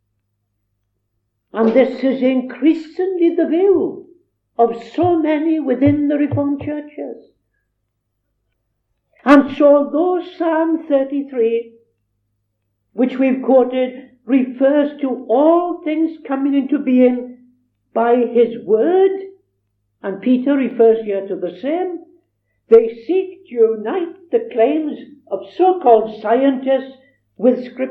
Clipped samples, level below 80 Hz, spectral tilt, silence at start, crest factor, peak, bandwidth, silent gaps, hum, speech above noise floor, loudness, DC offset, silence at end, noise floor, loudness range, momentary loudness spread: under 0.1%; -62 dBFS; -8.5 dB/octave; 1.55 s; 16 dB; 0 dBFS; 5.8 kHz; none; none; 56 dB; -16 LUFS; under 0.1%; 0 s; -72 dBFS; 3 LU; 13 LU